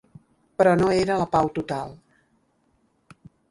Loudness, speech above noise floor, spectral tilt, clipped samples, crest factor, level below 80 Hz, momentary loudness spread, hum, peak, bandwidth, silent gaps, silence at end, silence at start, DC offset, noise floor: -22 LUFS; 45 dB; -6.5 dB/octave; under 0.1%; 20 dB; -52 dBFS; 16 LU; none; -6 dBFS; 11.5 kHz; none; 1.55 s; 0.6 s; under 0.1%; -67 dBFS